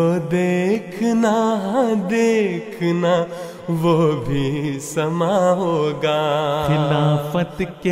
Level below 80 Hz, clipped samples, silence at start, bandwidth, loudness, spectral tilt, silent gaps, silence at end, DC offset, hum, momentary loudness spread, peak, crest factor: -48 dBFS; under 0.1%; 0 s; 16 kHz; -19 LUFS; -6.5 dB/octave; none; 0 s; under 0.1%; none; 6 LU; -6 dBFS; 14 dB